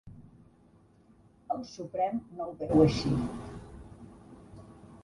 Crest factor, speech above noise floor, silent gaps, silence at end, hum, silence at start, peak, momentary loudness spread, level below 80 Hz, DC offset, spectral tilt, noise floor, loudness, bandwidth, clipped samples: 22 dB; 32 dB; none; 0.05 s; none; 0.05 s; -10 dBFS; 27 LU; -52 dBFS; under 0.1%; -7.5 dB/octave; -61 dBFS; -30 LUFS; 11.5 kHz; under 0.1%